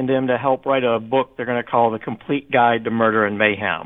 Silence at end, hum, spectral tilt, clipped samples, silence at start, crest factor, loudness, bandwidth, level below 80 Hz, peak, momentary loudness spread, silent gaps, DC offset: 0 s; none; -9 dB/octave; under 0.1%; 0 s; 18 dB; -19 LUFS; 3.9 kHz; -60 dBFS; -2 dBFS; 7 LU; none; 0.1%